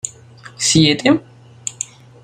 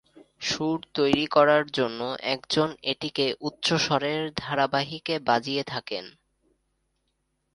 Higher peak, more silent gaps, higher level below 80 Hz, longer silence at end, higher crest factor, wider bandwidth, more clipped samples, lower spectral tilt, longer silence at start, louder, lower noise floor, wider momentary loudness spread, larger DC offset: about the same, -2 dBFS vs -4 dBFS; neither; first, -50 dBFS vs -62 dBFS; second, 0.4 s vs 1.45 s; about the same, 18 dB vs 22 dB; first, 15.5 kHz vs 11.5 kHz; neither; about the same, -3.5 dB/octave vs -4.5 dB/octave; second, 0.05 s vs 0.4 s; first, -15 LUFS vs -26 LUFS; second, -41 dBFS vs -75 dBFS; first, 16 LU vs 9 LU; neither